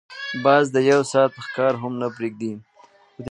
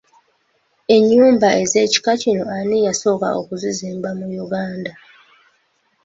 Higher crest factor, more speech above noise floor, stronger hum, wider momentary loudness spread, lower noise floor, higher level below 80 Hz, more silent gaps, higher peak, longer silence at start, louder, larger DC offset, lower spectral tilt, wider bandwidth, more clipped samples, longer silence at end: about the same, 18 dB vs 16 dB; second, 33 dB vs 47 dB; neither; about the same, 14 LU vs 14 LU; second, -53 dBFS vs -63 dBFS; about the same, -64 dBFS vs -60 dBFS; neither; about the same, -2 dBFS vs -2 dBFS; second, 0.1 s vs 0.9 s; second, -21 LUFS vs -17 LUFS; neither; first, -5.5 dB/octave vs -4 dB/octave; first, 11 kHz vs 8 kHz; neither; second, 0 s vs 1.15 s